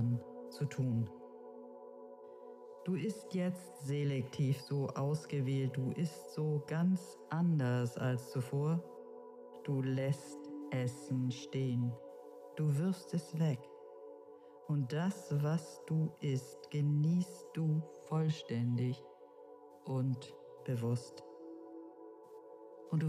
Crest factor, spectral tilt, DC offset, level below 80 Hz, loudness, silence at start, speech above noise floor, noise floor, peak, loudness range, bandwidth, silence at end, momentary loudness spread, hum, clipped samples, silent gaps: 14 dB; -7.5 dB/octave; under 0.1%; -84 dBFS; -37 LUFS; 0 s; 21 dB; -56 dBFS; -24 dBFS; 5 LU; 14 kHz; 0 s; 19 LU; none; under 0.1%; none